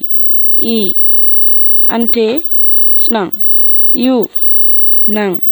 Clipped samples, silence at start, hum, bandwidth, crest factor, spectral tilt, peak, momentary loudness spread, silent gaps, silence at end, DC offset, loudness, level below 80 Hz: under 0.1%; 0 s; none; over 20 kHz; 8 dB; -6 dB/octave; 0 dBFS; 6 LU; none; 0 s; under 0.1%; -5 LUFS; -56 dBFS